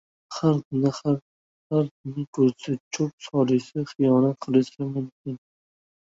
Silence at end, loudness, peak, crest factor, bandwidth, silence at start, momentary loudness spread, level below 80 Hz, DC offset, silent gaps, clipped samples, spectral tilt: 0.75 s; -25 LUFS; -6 dBFS; 18 dB; 7.8 kHz; 0.3 s; 12 LU; -66 dBFS; under 0.1%; 0.65-0.71 s, 1.22-1.70 s, 1.91-2.04 s, 2.28-2.33 s, 2.80-2.91 s, 3.13-3.18 s, 5.12-5.25 s; under 0.1%; -7.5 dB/octave